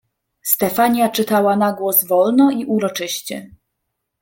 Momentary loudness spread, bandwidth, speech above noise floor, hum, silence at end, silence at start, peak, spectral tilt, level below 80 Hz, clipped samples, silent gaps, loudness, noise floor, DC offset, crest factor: 11 LU; 17 kHz; 59 dB; none; 0.75 s; 0.45 s; 0 dBFS; -4 dB/octave; -60 dBFS; under 0.1%; none; -16 LUFS; -76 dBFS; under 0.1%; 18 dB